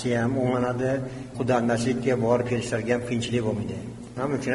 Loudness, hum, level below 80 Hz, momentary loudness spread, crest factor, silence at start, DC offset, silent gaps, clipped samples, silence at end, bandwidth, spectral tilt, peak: -26 LUFS; none; -52 dBFS; 8 LU; 16 dB; 0 s; under 0.1%; none; under 0.1%; 0 s; 11.5 kHz; -6.5 dB/octave; -10 dBFS